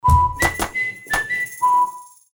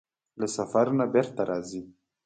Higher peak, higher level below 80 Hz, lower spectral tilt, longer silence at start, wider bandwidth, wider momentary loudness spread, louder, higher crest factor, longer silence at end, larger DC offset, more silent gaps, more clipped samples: first, -4 dBFS vs -10 dBFS; first, -30 dBFS vs -68 dBFS; second, -4 dB/octave vs -6 dB/octave; second, 0.05 s vs 0.35 s; first, over 20 kHz vs 9.4 kHz; second, 8 LU vs 12 LU; first, -19 LUFS vs -27 LUFS; about the same, 16 dB vs 18 dB; about the same, 0.25 s vs 0.35 s; neither; neither; neither